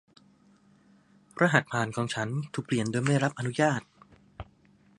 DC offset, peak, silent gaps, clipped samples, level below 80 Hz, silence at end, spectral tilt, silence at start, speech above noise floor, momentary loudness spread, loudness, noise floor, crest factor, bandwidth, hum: under 0.1%; -4 dBFS; none; under 0.1%; -62 dBFS; 0.55 s; -5.5 dB/octave; 1.35 s; 34 dB; 23 LU; -28 LUFS; -61 dBFS; 26 dB; 11.5 kHz; none